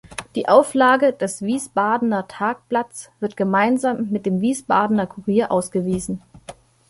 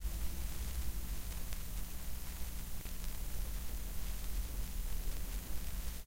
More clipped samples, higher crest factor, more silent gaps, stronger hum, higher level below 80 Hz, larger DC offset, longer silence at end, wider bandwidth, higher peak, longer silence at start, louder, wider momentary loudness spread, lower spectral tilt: neither; about the same, 18 dB vs 18 dB; neither; neither; second, -54 dBFS vs -42 dBFS; neither; first, 0.35 s vs 0 s; second, 11.5 kHz vs 16.5 kHz; first, -2 dBFS vs -20 dBFS; about the same, 0.1 s vs 0 s; first, -20 LUFS vs -44 LUFS; first, 10 LU vs 3 LU; first, -5.5 dB/octave vs -3.5 dB/octave